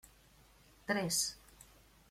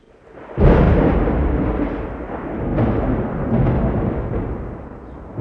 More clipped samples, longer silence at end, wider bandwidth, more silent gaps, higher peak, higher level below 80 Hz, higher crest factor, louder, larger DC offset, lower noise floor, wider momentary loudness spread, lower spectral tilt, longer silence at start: neither; first, 0.45 s vs 0 s; first, 16.5 kHz vs 5 kHz; neither; second, -20 dBFS vs 0 dBFS; second, -66 dBFS vs -24 dBFS; about the same, 22 dB vs 18 dB; second, -35 LUFS vs -19 LUFS; neither; first, -64 dBFS vs -41 dBFS; first, 23 LU vs 18 LU; second, -2.5 dB/octave vs -11 dB/octave; first, 0.9 s vs 0.35 s